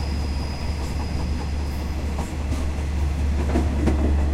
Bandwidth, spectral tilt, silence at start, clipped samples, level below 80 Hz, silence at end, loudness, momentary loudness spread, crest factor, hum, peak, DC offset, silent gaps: 12 kHz; -6.5 dB/octave; 0 s; under 0.1%; -26 dBFS; 0 s; -25 LUFS; 6 LU; 16 dB; none; -6 dBFS; under 0.1%; none